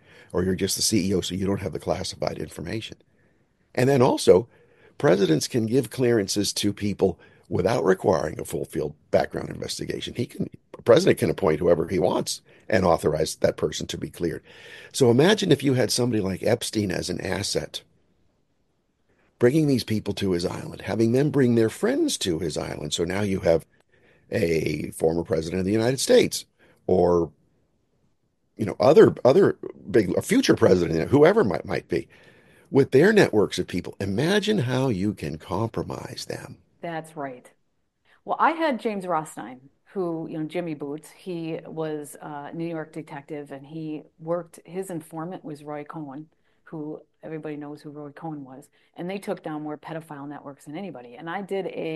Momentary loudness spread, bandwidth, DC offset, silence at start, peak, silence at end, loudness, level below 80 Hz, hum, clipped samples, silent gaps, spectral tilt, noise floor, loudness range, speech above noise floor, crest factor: 18 LU; 12.5 kHz; under 0.1%; 0.35 s; -2 dBFS; 0 s; -24 LUFS; -54 dBFS; none; under 0.1%; none; -5 dB/octave; -74 dBFS; 13 LU; 50 dB; 22 dB